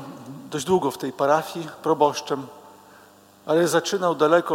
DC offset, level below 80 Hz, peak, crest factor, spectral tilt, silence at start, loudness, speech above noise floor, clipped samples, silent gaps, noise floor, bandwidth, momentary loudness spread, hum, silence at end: under 0.1%; -68 dBFS; -4 dBFS; 18 dB; -4.5 dB/octave; 0 s; -23 LUFS; 29 dB; under 0.1%; none; -51 dBFS; 17 kHz; 16 LU; none; 0 s